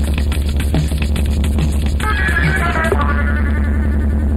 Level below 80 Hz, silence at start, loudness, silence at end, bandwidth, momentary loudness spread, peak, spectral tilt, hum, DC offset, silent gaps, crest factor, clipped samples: -16 dBFS; 0 s; -17 LUFS; 0 s; 13.5 kHz; 3 LU; -4 dBFS; -6 dB/octave; none; under 0.1%; none; 12 dB; under 0.1%